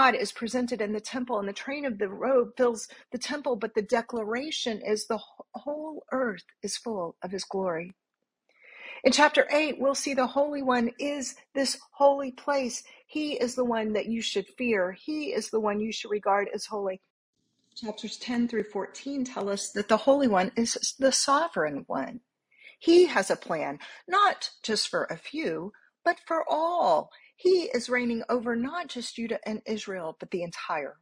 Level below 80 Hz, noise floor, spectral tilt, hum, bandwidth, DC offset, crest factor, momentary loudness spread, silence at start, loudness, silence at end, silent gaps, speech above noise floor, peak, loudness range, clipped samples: -70 dBFS; -77 dBFS; -3 dB/octave; none; 15.5 kHz; under 0.1%; 22 dB; 12 LU; 0 s; -28 LUFS; 0.1 s; 17.10-17.33 s; 50 dB; -6 dBFS; 6 LU; under 0.1%